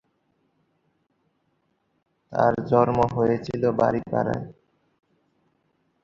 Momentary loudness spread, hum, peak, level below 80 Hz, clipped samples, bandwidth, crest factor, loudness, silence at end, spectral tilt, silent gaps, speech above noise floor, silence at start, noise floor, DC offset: 10 LU; none; -4 dBFS; -54 dBFS; under 0.1%; 7.4 kHz; 22 dB; -23 LUFS; 1.5 s; -8.5 dB/octave; none; 49 dB; 2.3 s; -71 dBFS; under 0.1%